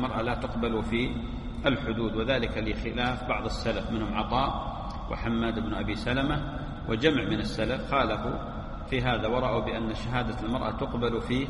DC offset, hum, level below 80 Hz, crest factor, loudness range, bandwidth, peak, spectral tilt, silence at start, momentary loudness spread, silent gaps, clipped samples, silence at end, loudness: under 0.1%; none; -38 dBFS; 20 dB; 2 LU; 11.5 kHz; -8 dBFS; -6.5 dB/octave; 0 s; 7 LU; none; under 0.1%; 0 s; -29 LUFS